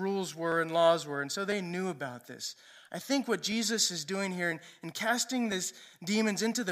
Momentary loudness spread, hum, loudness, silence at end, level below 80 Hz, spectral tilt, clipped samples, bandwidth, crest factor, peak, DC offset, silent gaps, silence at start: 14 LU; none; -31 LUFS; 0 s; -82 dBFS; -3 dB/octave; under 0.1%; 15.5 kHz; 20 dB; -12 dBFS; under 0.1%; none; 0 s